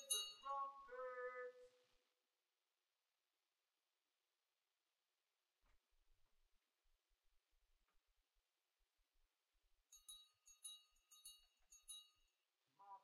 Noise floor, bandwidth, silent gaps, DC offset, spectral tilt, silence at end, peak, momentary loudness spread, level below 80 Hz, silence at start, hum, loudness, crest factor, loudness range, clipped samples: under -90 dBFS; 15.5 kHz; none; under 0.1%; 2.5 dB/octave; 0.05 s; -30 dBFS; 17 LU; -88 dBFS; 0 s; none; -53 LUFS; 30 dB; 11 LU; under 0.1%